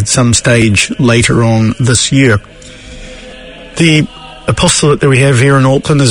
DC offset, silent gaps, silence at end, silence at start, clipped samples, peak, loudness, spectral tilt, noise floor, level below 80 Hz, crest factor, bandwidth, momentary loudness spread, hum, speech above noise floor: under 0.1%; none; 0 s; 0 s; 0.5%; 0 dBFS; -9 LUFS; -4.5 dB/octave; -30 dBFS; -32 dBFS; 10 dB; 11 kHz; 21 LU; none; 21 dB